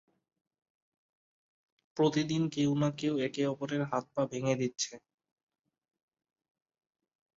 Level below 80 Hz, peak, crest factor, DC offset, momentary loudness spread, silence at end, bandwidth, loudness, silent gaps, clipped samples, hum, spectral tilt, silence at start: -74 dBFS; -16 dBFS; 20 dB; under 0.1%; 5 LU; 2.4 s; 7.8 kHz; -32 LUFS; none; under 0.1%; none; -5.5 dB/octave; 1.95 s